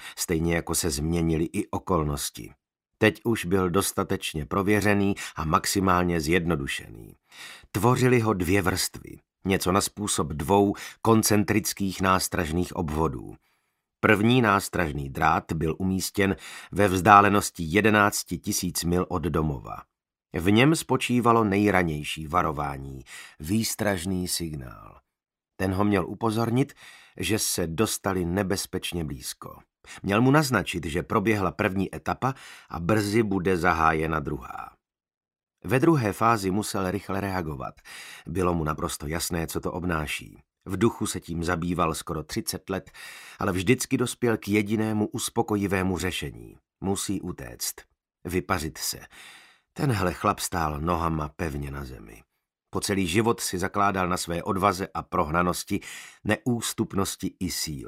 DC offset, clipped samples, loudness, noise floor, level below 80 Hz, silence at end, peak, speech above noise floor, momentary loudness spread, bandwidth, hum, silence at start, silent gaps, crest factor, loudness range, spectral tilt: under 0.1%; under 0.1%; -25 LUFS; -75 dBFS; -46 dBFS; 0 s; 0 dBFS; 50 dB; 14 LU; 16 kHz; none; 0 s; none; 26 dB; 7 LU; -5 dB/octave